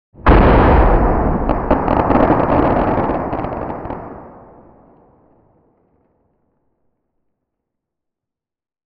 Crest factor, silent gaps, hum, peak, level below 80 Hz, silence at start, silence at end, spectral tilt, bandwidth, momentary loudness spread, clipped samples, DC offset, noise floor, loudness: 16 dB; none; none; 0 dBFS; -22 dBFS; 0.2 s; 4.55 s; -10.5 dB/octave; 5.2 kHz; 16 LU; under 0.1%; under 0.1%; -84 dBFS; -15 LUFS